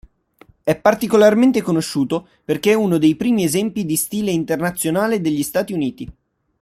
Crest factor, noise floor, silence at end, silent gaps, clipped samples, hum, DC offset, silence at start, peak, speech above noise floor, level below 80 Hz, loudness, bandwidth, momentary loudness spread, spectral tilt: 16 dB; -51 dBFS; 0.5 s; none; under 0.1%; none; under 0.1%; 0.65 s; -2 dBFS; 34 dB; -52 dBFS; -18 LUFS; 16 kHz; 10 LU; -5 dB/octave